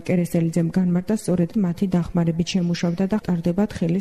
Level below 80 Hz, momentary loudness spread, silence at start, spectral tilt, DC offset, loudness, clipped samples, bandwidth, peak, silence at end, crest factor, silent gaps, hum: -46 dBFS; 2 LU; 0 s; -7 dB/octave; under 0.1%; -22 LUFS; under 0.1%; 13 kHz; -8 dBFS; 0 s; 12 dB; none; none